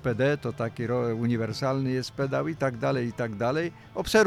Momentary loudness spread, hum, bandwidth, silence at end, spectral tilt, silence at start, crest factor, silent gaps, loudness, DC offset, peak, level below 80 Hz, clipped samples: 5 LU; none; 15 kHz; 0 s; -6 dB/octave; 0 s; 18 dB; none; -28 LUFS; under 0.1%; -8 dBFS; -54 dBFS; under 0.1%